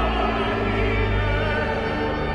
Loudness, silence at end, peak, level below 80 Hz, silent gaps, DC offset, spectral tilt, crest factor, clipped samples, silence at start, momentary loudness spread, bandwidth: -23 LUFS; 0 s; -10 dBFS; -28 dBFS; none; under 0.1%; -7 dB/octave; 12 dB; under 0.1%; 0 s; 2 LU; 9 kHz